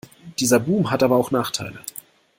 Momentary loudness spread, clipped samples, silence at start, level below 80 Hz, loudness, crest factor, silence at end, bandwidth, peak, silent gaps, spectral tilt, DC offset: 17 LU; under 0.1%; 0.25 s; -58 dBFS; -20 LUFS; 20 dB; 0.5 s; 16.5 kHz; -2 dBFS; none; -4.5 dB/octave; under 0.1%